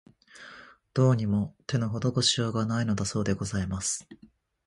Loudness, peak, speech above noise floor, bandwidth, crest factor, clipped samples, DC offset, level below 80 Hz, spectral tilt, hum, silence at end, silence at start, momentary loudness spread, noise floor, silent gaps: -28 LUFS; -10 dBFS; 23 dB; 11.5 kHz; 20 dB; under 0.1%; under 0.1%; -50 dBFS; -5 dB/octave; none; 0.5 s; 0.35 s; 14 LU; -50 dBFS; none